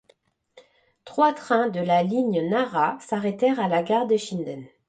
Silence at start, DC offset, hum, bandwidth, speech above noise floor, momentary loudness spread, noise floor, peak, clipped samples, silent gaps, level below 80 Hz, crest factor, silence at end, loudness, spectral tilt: 0.55 s; under 0.1%; none; 9.2 kHz; 40 dB; 7 LU; -63 dBFS; -8 dBFS; under 0.1%; none; -70 dBFS; 16 dB; 0.2 s; -23 LUFS; -6 dB/octave